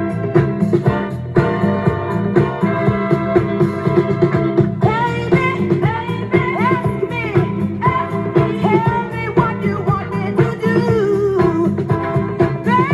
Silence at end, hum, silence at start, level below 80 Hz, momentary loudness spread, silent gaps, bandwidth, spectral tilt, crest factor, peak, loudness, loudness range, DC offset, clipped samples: 0 s; none; 0 s; -42 dBFS; 4 LU; none; 11.5 kHz; -9 dB/octave; 14 dB; 0 dBFS; -17 LUFS; 1 LU; under 0.1%; under 0.1%